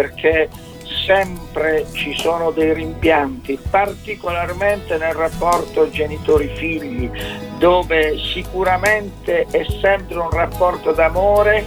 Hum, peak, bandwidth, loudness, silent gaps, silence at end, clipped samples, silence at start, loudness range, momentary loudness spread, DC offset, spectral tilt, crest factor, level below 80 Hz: none; -2 dBFS; 19 kHz; -18 LUFS; none; 0 s; under 0.1%; 0 s; 2 LU; 8 LU; 0.1%; -5 dB/octave; 16 dB; -32 dBFS